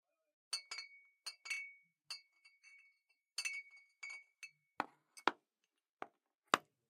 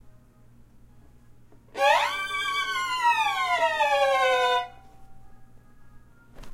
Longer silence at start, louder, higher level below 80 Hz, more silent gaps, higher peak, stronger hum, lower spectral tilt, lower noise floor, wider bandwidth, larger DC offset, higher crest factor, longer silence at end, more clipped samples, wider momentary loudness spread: first, 0.5 s vs 0.05 s; second, -45 LUFS vs -24 LUFS; second, under -90 dBFS vs -56 dBFS; first, 5.89-5.97 s vs none; about the same, -10 dBFS vs -10 dBFS; neither; about the same, -0.5 dB/octave vs -1 dB/octave; first, -89 dBFS vs -53 dBFS; about the same, 15.5 kHz vs 16 kHz; neither; first, 38 dB vs 18 dB; first, 0.3 s vs 0 s; neither; first, 22 LU vs 6 LU